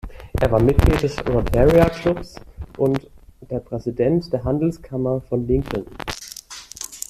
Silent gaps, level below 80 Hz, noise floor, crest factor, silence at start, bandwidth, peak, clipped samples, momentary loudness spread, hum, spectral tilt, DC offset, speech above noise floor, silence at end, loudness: none; -30 dBFS; -38 dBFS; 20 dB; 0.05 s; 15.5 kHz; -2 dBFS; under 0.1%; 17 LU; none; -6.5 dB/octave; under 0.1%; 19 dB; 0.1 s; -21 LUFS